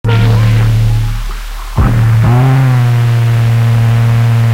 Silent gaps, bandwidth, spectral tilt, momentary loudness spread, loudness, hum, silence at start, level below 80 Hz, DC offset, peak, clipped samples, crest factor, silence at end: none; 15 kHz; -7 dB/octave; 9 LU; -10 LUFS; none; 0.05 s; -20 dBFS; under 0.1%; 0 dBFS; under 0.1%; 8 dB; 0 s